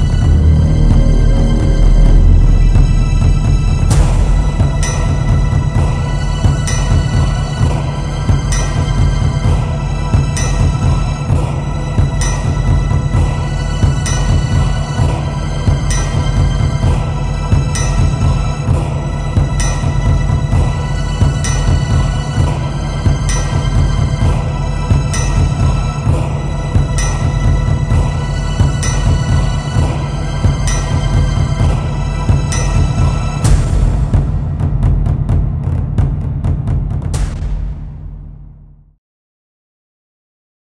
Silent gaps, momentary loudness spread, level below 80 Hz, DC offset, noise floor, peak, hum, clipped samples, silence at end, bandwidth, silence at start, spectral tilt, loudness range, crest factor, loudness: none; 6 LU; -16 dBFS; under 0.1%; -39 dBFS; 0 dBFS; none; under 0.1%; 2.25 s; 11 kHz; 0 s; -6 dB/octave; 3 LU; 12 dB; -15 LUFS